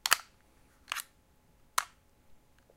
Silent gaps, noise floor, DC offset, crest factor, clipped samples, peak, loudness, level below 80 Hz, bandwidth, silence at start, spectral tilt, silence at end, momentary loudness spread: none; -66 dBFS; under 0.1%; 36 dB; under 0.1%; -4 dBFS; -34 LUFS; -70 dBFS; 16.5 kHz; 0.05 s; 2 dB/octave; 0.4 s; 17 LU